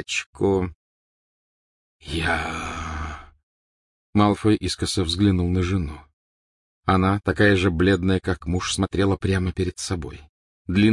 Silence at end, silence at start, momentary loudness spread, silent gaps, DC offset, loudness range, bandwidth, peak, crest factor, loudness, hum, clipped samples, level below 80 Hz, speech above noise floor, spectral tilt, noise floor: 0 s; 0 s; 12 LU; 0.26-0.33 s, 0.75-2.00 s, 3.43-4.13 s, 6.13-6.82 s, 10.29-10.65 s; under 0.1%; 7 LU; 11.5 kHz; -4 dBFS; 20 dB; -23 LUFS; none; under 0.1%; -42 dBFS; over 68 dB; -5.5 dB/octave; under -90 dBFS